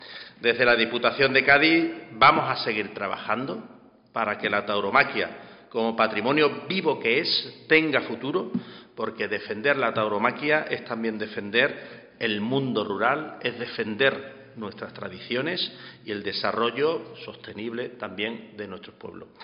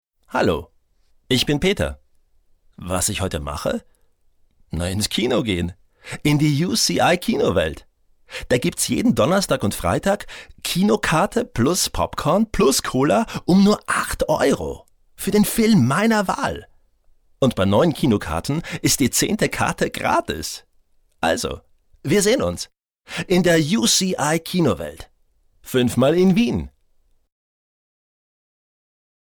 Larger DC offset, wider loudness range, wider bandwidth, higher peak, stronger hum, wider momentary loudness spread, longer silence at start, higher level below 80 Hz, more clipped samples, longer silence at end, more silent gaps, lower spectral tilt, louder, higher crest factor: neither; about the same, 7 LU vs 5 LU; second, 5.6 kHz vs over 20 kHz; about the same, -4 dBFS vs -6 dBFS; neither; first, 18 LU vs 12 LU; second, 0 s vs 0.3 s; second, -64 dBFS vs -42 dBFS; neither; second, 0 s vs 2.65 s; neither; second, -2 dB/octave vs -4.5 dB/octave; second, -24 LUFS vs -20 LUFS; first, 22 dB vs 14 dB